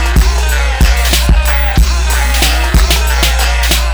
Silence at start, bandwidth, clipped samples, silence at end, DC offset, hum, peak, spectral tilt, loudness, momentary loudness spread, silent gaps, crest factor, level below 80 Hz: 0 s; over 20 kHz; under 0.1%; 0 s; under 0.1%; none; 0 dBFS; -3.5 dB/octave; -11 LUFS; 2 LU; none; 8 dB; -10 dBFS